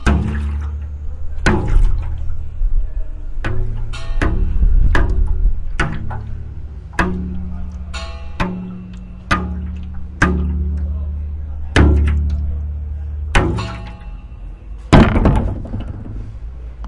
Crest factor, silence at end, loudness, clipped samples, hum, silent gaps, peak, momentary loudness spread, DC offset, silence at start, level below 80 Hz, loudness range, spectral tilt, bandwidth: 16 dB; 0 s; -20 LUFS; under 0.1%; none; none; 0 dBFS; 16 LU; under 0.1%; 0 s; -20 dBFS; 6 LU; -6.5 dB/octave; 11 kHz